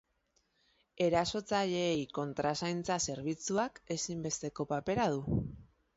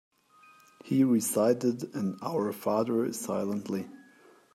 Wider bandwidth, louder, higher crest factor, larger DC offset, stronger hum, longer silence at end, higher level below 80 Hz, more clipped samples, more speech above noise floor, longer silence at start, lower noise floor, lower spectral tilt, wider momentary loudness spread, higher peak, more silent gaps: second, 8 kHz vs 15.5 kHz; second, -34 LUFS vs -29 LUFS; about the same, 16 dB vs 18 dB; neither; neither; second, 0.3 s vs 0.55 s; first, -58 dBFS vs -78 dBFS; neither; first, 43 dB vs 31 dB; about the same, 0.95 s vs 0.85 s; first, -77 dBFS vs -59 dBFS; second, -4.5 dB/octave vs -6 dB/octave; second, 6 LU vs 9 LU; second, -18 dBFS vs -12 dBFS; neither